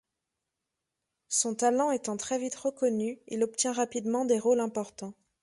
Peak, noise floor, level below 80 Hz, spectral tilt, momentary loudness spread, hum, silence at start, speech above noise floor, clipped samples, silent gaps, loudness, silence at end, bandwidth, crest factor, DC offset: -14 dBFS; -86 dBFS; -74 dBFS; -3.5 dB/octave; 8 LU; none; 1.3 s; 57 dB; under 0.1%; none; -29 LUFS; 0.3 s; 11.5 kHz; 18 dB; under 0.1%